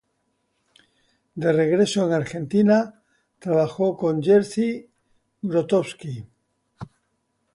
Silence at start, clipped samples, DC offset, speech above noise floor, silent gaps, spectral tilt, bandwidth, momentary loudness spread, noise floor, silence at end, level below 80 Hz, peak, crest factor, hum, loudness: 1.35 s; under 0.1%; under 0.1%; 51 dB; none; -6.5 dB/octave; 11.5 kHz; 19 LU; -72 dBFS; 0.7 s; -64 dBFS; -6 dBFS; 16 dB; none; -22 LUFS